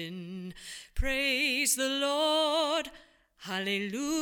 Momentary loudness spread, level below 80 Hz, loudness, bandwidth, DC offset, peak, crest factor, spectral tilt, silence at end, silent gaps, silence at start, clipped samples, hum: 16 LU; -44 dBFS; -29 LUFS; 19 kHz; under 0.1%; -16 dBFS; 16 dB; -2.5 dB/octave; 0 s; none; 0 s; under 0.1%; none